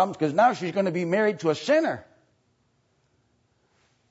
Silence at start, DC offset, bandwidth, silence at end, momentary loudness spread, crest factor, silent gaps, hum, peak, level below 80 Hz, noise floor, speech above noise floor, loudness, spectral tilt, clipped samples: 0 s; under 0.1%; 8 kHz; 2.1 s; 6 LU; 18 dB; none; none; -8 dBFS; -74 dBFS; -69 dBFS; 45 dB; -24 LUFS; -6 dB/octave; under 0.1%